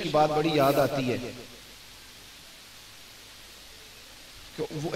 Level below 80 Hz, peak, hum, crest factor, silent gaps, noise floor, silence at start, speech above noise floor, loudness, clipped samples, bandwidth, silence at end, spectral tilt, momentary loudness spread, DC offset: -58 dBFS; -10 dBFS; none; 20 dB; none; -49 dBFS; 0 s; 23 dB; -26 LUFS; under 0.1%; 16 kHz; 0 s; -5.5 dB/octave; 22 LU; under 0.1%